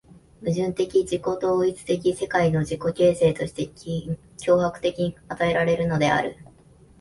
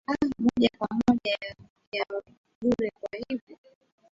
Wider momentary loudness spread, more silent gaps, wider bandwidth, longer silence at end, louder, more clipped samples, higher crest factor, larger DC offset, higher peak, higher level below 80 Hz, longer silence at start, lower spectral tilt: second, 9 LU vs 12 LU; second, none vs 1.70-1.76 s, 1.87-1.92 s, 2.38-2.44 s, 2.55-2.61 s, 3.41-3.47 s; first, 11.5 kHz vs 7.6 kHz; about the same, 0.6 s vs 0.6 s; first, -24 LUFS vs -28 LUFS; neither; about the same, 16 dB vs 20 dB; neither; about the same, -8 dBFS vs -8 dBFS; first, -50 dBFS vs -56 dBFS; first, 0.4 s vs 0.1 s; about the same, -6 dB/octave vs -6 dB/octave